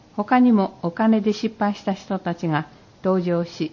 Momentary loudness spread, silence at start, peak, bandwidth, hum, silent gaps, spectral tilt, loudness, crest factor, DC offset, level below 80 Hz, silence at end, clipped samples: 10 LU; 0.15 s; -6 dBFS; 7.2 kHz; none; none; -7.5 dB/octave; -22 LUFS; 14 dB; under 0.1%; -60 dBFS; 0.05 s; under 0.1%